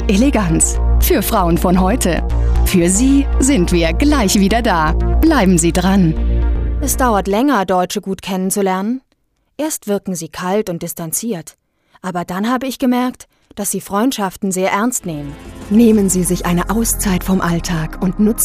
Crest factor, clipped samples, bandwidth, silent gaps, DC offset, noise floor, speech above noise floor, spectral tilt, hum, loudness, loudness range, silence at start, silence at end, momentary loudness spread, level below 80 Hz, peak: 14 dB; under 0.1%; 15.5 kHz; none; under 0.1%; -63 dBFS; 48 dB; -5 dB/octave; none; -15 LUFS; 7 LU; 0 s; 0 s; 10 LU; -22 dBFS; 0 dBFS